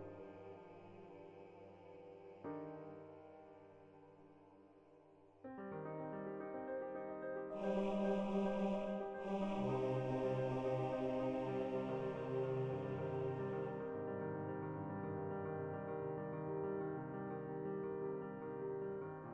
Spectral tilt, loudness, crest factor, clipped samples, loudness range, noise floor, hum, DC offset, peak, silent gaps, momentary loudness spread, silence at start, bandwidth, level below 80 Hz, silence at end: -8.5 dB/octave; -43 LUFS; 16 dB; under 0.1%; 15 LU; -66 dBFS; none; under 0.1%; -28 dBFS; none; 19 LU; 0 s; 8.2 kHz; -70 dBFS; 0 s